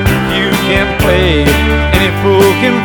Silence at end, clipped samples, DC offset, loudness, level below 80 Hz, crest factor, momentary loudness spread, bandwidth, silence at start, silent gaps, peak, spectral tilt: 0 s; 0.6%; under 0.1%; -10 LUFS; -18 dBFS; 10 dB; 3 LU; over 20 kHz; 0 s; none; 0 dBFS; -5.5 dB/octave